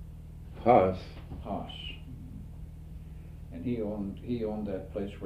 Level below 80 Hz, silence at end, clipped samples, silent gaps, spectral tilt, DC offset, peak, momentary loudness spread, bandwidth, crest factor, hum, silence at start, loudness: -46 dBFS; 0 s; under 0.1%; none; -8 dB/octave; under 0.1%; -8 dBFS; 23 LU; 15 kHz; 24 dB; none; 0 s; -31 LUFS